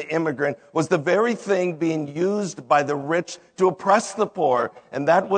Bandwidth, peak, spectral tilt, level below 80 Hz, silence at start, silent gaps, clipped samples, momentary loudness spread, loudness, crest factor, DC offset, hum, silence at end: 9.4 kHz; -4 dBFS; -5.5 dB/octave; -74 dBFS; 0 s; none; under 0.1%; 6 LU; -22 LUFS; 18 dB; under 0.1%; none; 0 s